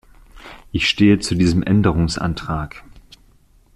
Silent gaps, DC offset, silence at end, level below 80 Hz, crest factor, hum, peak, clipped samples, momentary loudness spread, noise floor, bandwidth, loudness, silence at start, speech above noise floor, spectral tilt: none; under 0.1%; 0.95 s; -36 dBFS; 16 dB; none; -2 dBFS; under 0.1%; 12 LU; -52 dBFS; 12 kHz; -18 LUFS; 0.35 s; 35 dB; -5.5 dB/octave